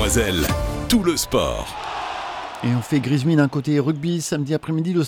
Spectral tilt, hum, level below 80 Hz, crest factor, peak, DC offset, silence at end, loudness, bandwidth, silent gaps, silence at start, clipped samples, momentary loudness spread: -5 dB/octave; none; -34 dBFS; 18 dB; -2 dBFS; under 0.1%; 0 s; -21 LUFS; 19.5 kHz; none; 0 s; under 0.1%; 10 LU